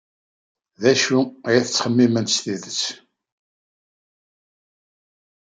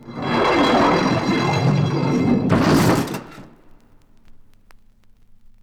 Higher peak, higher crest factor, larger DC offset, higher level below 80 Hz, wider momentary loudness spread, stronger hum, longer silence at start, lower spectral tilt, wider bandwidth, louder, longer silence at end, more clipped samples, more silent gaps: about the same, -2 dBFS vs -4 dBFS; about the same, 20 dB vs 16 dB; neither; second, -70 dBFS vs -44 dBFS; about the same, 7 LU vs 6 LU; neither; first, 0.8 s vs 0.05 s; second, -4 dB/octave vs -6 dB/octave; second, 9.4 kHz vs over 20 kHz; about the same, -20 LUFS vs -18 LUFS; first, 2.5 s vs 1.25 s; neither; neither